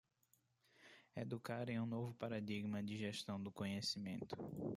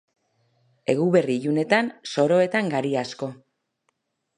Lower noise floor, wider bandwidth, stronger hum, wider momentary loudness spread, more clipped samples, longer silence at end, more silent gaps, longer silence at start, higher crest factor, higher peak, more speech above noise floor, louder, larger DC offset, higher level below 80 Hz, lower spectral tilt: first, -80 dBFS vs -74 dBFS; first, 15.5 kHz vs 10.5 kHz; neither; second, 6 LU vs 12 LU; neither; second, 0 s vs 1.05 s; neither; about the same, 0.8 s vs 0.9 s; about the same, 16 dB vs 20 dB; second, -30 dBFS vs -6 dBFS; second, 35 dB vs 52 dB; second, -46 LUFS vs -23 LUFS; neither; second, -80 dBFS vs -72 dBFS; about the same, -5.5 dB/octave vs -6 dB/octave